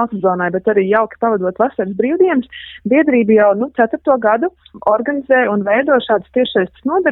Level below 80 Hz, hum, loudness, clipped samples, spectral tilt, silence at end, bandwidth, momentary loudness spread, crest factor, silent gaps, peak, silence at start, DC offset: -54 dBFS; none; -15 LUFS; under 0.1%; -9.5 dB/octave; 0 s; 4.1 kHz; 6 LU; 12 dB; none; -2 dBFS; 0 s; under 0.1%